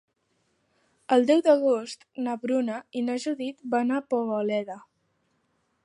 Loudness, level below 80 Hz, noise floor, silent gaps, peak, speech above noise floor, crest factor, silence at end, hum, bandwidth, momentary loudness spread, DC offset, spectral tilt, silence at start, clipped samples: -26 LUFS; -82 dBFS; -72 dBFS; none; -8 dBFS; 47 dB; 20 dB; 1.05 s; none; 11 kHz; 13 LU; under 0.1%; -5 dB/octave; 1.1 s; under 0.1%